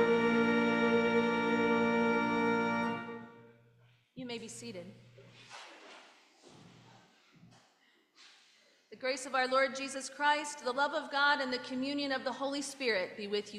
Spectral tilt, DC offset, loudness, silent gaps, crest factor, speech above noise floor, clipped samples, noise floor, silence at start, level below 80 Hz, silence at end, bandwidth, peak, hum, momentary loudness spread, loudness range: -4 dB/octave; under 0.1%; -32 LUFS; none; 18 dB; 35 dB; under 0.1%; -70 dBFS; 0 s; -74 dBFS; 0 s; 12 kHz; -16 dBFS; none; 20 LU; 18 LU